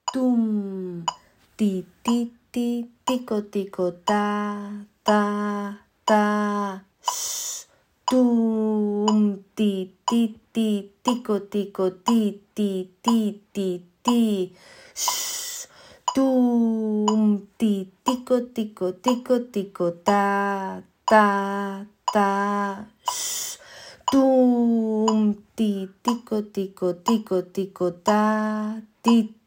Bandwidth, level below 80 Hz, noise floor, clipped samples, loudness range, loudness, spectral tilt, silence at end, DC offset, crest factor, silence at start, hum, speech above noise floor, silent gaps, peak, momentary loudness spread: 16.5 kHz; -66 dBFS; -47 dBFS; under 0.1%; 3 LU; -24 LUFS; -4.5 dB/octave; 0.15 s; under 0.1%; 20 dB; 0.05 s; none; 24 dB; none; -4 dBFS; 11 LU